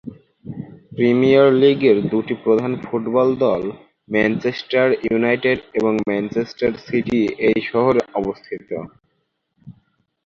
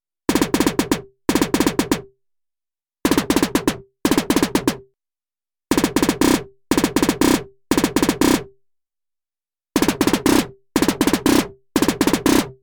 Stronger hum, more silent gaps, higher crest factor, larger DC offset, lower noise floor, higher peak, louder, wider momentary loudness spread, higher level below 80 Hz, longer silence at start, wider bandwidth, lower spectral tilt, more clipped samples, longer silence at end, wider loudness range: neither; neither; about the same, 16 dB vs 18 dB; neither; second, -70 dBFS vs under -90 dBFS; about the same, -2 dBFS vs -2 dBFS; about the same, -18 LUFS vs -19 LUFS; first, 17 LU vs 7 LU; second, -54 dBFS vs -40 dBFS; second, 0.05 s vs 0.3 s; second, 7 kHz vs over 20 kHz; first, -7.5 dB/octave vs -4 dB/octave; neither; first, 0.55 s vs 0.1 s; about the same, 5 LU vs 3 LU